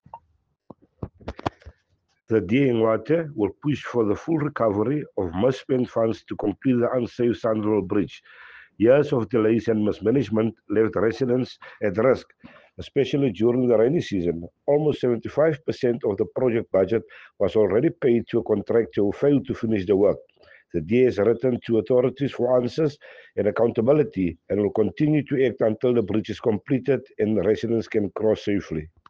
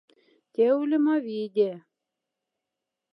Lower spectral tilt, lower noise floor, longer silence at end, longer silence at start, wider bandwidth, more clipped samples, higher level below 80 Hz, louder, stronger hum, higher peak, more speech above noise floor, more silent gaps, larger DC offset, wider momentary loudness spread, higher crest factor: about the same, -8.5 dB/octave vs -8.5 dB/octave; second, -69 dBFS vs -86 dBFS; second, 0.2 s vs 1.35 s; second, 0.15 s vs 0.6 s; first, 7.2 kHz vs 5.4 kHz; neither; first, -54 dBFS vs under -90 dBFS; about the same, -23 LUFS vs -25 LUFS; neither; first, -6 dBFS vs -12 dBFS; second, 47 dB vs 62 dB; neither; neither; second, 7 LU vs 10 LU; about the same, 16 dB vs 16 dB